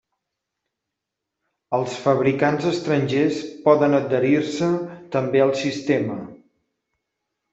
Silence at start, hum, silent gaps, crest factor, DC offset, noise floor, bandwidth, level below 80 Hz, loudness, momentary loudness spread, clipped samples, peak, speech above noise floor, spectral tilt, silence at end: 1.7 s; none; none; 18 dB; under 0.1%; -83 dBFS; 8 kHz; -64 dBFS; -21 LUFS; 9 LU; under 0.1%; -4 dBFS; 63 dB; -6.5 dB/octave; 1.15 s